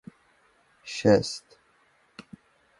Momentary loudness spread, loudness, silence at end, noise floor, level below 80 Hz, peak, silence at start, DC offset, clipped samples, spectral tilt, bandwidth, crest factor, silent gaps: 26 LU; -25 LUFS; 0.6 s; -65 dBFS; -60 dBFS; -6 dBFS; 0.85 s; under 0.1%; under 0.1%; -5.5 dB/octave; 11.5 kHz; 24 dB; none